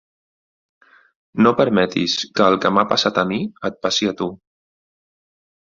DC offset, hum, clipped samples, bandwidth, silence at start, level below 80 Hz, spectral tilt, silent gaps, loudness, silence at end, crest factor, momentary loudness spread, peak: under 0.1%; none; under 0.1%; 7.6 kHz; 1.35 s; -58 dBFS; -4.5 dB/octave; none; -18 LUFS; 1.45 s; 20 dB; 11 LU; -2 dBFS